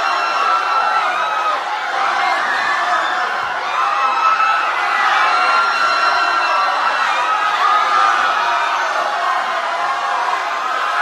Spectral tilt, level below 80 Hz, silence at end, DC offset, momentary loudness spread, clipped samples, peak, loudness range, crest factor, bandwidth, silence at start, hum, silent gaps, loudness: 0 dB/octave; -66 dBFS; 0 s; under 0.1%; 5 LU; under 0.1%; -2 dBFS; 2 LU; 14 dB; 13 kHz; 0 s; none; none; -15 LUFS